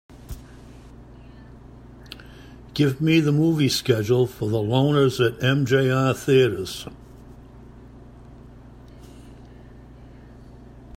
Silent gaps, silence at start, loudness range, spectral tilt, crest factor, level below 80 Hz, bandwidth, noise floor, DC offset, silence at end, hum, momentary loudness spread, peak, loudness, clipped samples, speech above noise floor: none; 0.15 s; 7 LU; -6 dB/octave; 20 dB; -48 dBFS; 16 kHz; -44 dBFS; under 0.1%; 0.1 s; none; 22 LU; -6 dBFS; -21 LUFS; under 0.1%; 24 dB